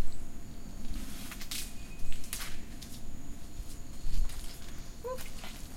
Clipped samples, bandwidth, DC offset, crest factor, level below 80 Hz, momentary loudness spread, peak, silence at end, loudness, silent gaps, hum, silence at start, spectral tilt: under 0.1%; 16 kHz; under 0.1%; 14 dB; -38 dBFS; 9 LU; -16 dBFS; 0 s; -43 LUFS; none; none; 0 s; -3.5 dB/octave